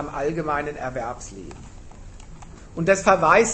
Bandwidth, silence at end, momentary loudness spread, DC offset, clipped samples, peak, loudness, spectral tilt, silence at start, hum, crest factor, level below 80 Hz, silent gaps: 8.8 kHz; 0 s; 24 LU; under 0.1%; under 0.1%; -2 dBFS; -22 LUFS; -4.5 dB/octave; 0 s; none; 22 dB; -42 dBFS; none